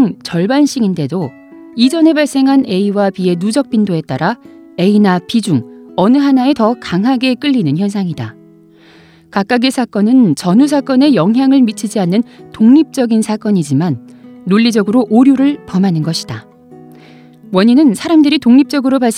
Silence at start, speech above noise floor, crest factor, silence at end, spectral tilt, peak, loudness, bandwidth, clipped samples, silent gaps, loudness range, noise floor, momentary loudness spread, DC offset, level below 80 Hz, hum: 0 s; 31 dB; 12 dB; 0 s; -6 dB/octave; 0 dBFS; -12 LUFS; 13.5 kHz; under 0.1%; none; 3 LU; -42 dBFS; 10 LU; under 0.1%; -58 dBFS; none